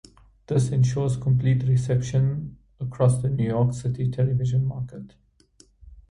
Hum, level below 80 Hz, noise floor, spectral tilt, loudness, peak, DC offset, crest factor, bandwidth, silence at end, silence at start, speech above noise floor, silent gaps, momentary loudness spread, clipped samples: none; -48 dBFS; -58 dBFS; -8 dB/octave; -24 LUFS; -8 dBFS; under 0.1%; 16 dB; 11 kHz; 0.1 s; 0.5 s; 35 dB; none; 13 LU; under 0.1%